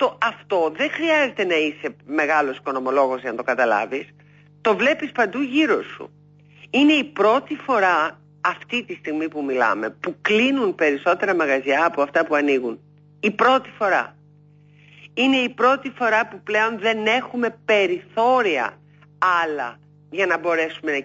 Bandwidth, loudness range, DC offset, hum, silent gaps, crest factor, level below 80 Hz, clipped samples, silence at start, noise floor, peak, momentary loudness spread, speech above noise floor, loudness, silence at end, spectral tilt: 8 kHz; 2 LU; under 0.1%; 50 Hz at -50 dBFS; none; 16 dB; -70 dBFS; under 0.1%; 0 s; -51 dBFS; -6 dBFS; 8 LU; 31 dB; -20 LUFS; 0 s; -4.5 dB/octave